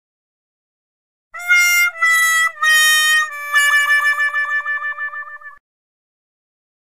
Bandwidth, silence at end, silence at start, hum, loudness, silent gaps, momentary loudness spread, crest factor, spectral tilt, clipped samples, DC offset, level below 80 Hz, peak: 15.5 kHz; 1.5 s; 1.35 s; none; -13 LUFS; none; 14 LU; 16 dB; 6 dB/octave; under 0.1%; 0.4%; -70 dBFS; -2 dBFS